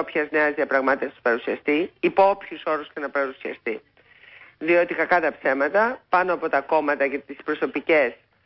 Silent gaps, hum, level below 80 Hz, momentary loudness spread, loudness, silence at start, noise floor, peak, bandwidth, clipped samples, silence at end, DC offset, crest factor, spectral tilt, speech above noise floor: none; none; -66 dBFS; 9 LU; -23 LUFS; 0 s; -51 dBFS; -6 dBFS; 5.8 kHz; under 0.1%; 0.3 s; under 0.1%; 16 dB; -9 dB/octave; 28 dB